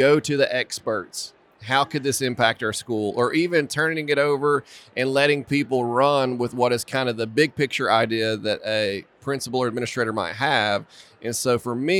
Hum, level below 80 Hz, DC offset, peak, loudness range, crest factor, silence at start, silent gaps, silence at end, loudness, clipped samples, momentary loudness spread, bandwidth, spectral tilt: none; -66 dBFS; under 0.1%; -4 dBFS; 3 LU; 18 dB; 0 s; none; 0 s; -22 LUFS; under 0.1%; 8 LU; 16.5 kHz; -4 dB/octave